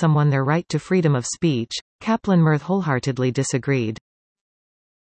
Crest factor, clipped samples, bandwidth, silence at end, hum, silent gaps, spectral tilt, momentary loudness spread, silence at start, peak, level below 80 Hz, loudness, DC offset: 16 dB; under 0.1%; 8.8 kHz; 1.25 s; none; 1.81-1.99 s; -6 dB/octave; 8 LU; 0 s; -6 dBFS; -58 dBFS; -21 LUFS; under 0.1%